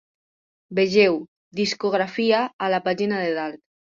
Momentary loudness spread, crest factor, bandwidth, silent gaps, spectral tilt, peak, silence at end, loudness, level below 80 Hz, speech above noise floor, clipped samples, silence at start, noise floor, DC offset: 11 LU; 18 dB; 7.6 kHz; 1.28-1.51 s, 2.53-2.59 s; -5 dB/octave; -4 dBFS; 0.4 s; -22 LUFS; -66 dBFS; over 69 dB; under 0.1%; 0.7 s; under -90 dBFS; under 0.1%